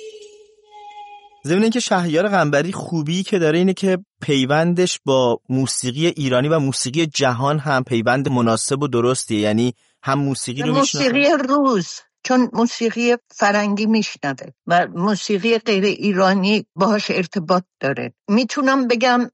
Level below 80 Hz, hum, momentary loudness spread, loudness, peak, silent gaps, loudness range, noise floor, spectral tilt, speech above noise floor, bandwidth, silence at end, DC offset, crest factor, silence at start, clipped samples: -62 dBFS; none; 7 LU; -18 LUFS; -6 dBFS; 4.07-4.11 s; 1 LU; -46 dBFS; -5 dB/octave; 28 dB; 11.5 kHz; 0.05 s; under 0.1%; 14 dB; 0 s; under 0.1%